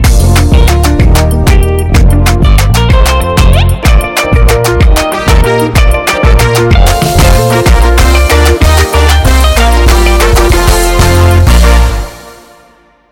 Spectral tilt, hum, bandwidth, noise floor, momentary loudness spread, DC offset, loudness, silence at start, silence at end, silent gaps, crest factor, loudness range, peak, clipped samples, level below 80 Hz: -5 dB/octave; none; 18 kHz; -43 dBFS; 2 LU; under 0.1%; -7 LUFS; 0 s; 0.8 s; none; 6 dB; 1 LU; 0 dBFS; 4%; -8 dBFS